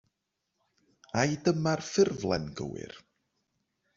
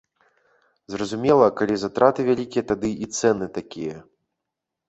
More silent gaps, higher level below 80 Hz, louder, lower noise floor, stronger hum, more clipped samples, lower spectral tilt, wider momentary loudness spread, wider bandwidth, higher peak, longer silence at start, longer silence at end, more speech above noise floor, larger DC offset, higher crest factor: neither; second, -62 dBFS vs -56 dBFS; second, -30 LUFS vs -22 LUFS; about the same, -83 dBFS vs -83 dBFS; neither; neither; about the same, -5.5 dB/octave vs -5.5 dB/octave; second, 12 LU vs 15 LU; about the same, 7.6 kHz vs 8.2 kHz; second, -12 dBFS vs -2 dBFS; first, 1.15 s vs 0.9 s; about the same, 1 s vs 0.9 s; second, 54 dB vs 62 dB; neither; about the same, 22 dB vs 22 dB